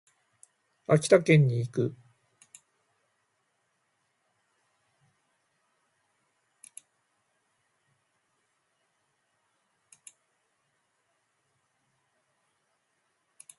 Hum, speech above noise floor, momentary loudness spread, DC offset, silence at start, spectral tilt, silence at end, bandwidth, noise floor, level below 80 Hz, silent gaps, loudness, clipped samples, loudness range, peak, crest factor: none; 53 dB; 13 LU; under 0.1%; 0.9 s; -6.5 dB/octave; 11.65 s; 11.5 kHz; -76 dBFS; -74 dBFS; none; -24 LUFS; under 0.1%; 13 LU; -8 dBFS; 26 dB